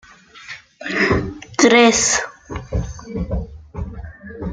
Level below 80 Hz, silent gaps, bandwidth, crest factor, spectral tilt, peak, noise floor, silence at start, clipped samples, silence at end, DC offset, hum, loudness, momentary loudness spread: -34 dBFS; none; 10 kHz; 18 dB; -3.5 dB/octave; 0 dBFS; -39 dBFS; 0.35 s; under 0.1%; 0 s; under 0.1%; none; -17 LUFS; 24 LU